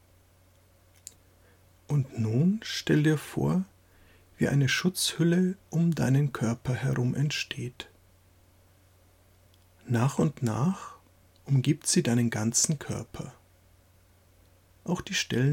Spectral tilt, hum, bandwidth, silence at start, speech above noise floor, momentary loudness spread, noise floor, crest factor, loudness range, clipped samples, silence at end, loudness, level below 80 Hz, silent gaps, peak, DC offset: -5 dB/octave; none; 16.5 kHz; 1.9 s; 34 dB; 17 LU; -61 dBFS; 18 dB; 6 LU; under 0.1%; 0 s; -28 LUFS; -60 dBFS; none; -12 dBFS; under 0.1%